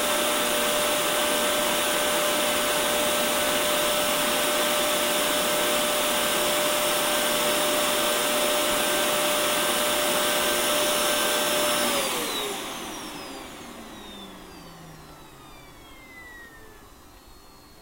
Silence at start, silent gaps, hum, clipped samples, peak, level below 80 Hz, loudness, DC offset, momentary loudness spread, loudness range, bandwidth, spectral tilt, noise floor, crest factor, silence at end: 0 s; none; none; under 0.1%; -10 dBFS; -54 dBFS; -22 LUFS; under 0.1%; 18 LU; 14 LU; 16 kHz; -1 dB/octave; -49 dBFS; 14 dB; 0 s